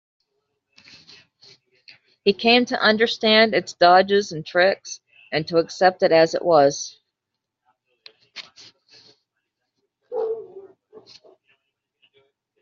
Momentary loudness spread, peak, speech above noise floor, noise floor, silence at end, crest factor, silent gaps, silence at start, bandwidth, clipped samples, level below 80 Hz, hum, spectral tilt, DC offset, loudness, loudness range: 19 LU; -2 dBFS; 64 dB; -82 dBFS; 2 s; 20 dB; none; 2.25 s; 7.6 kHz; under 0.1%; -68 dBFS; none; -1.5 dB/octave; under 0.1%; -19 LUFS; 18 LU